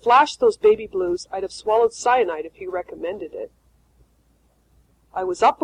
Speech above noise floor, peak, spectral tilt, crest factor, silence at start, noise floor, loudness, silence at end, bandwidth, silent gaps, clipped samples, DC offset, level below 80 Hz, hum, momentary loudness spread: 41 dB; -2 dBFS; -3.5 dB/octave; 18 dB; 0.05 s; -61 dBFS; -21 LUFS; 0.1 s; 10 kHz; none; under 0.1%; under 0.1%; -56 dBFS; none; 15 LU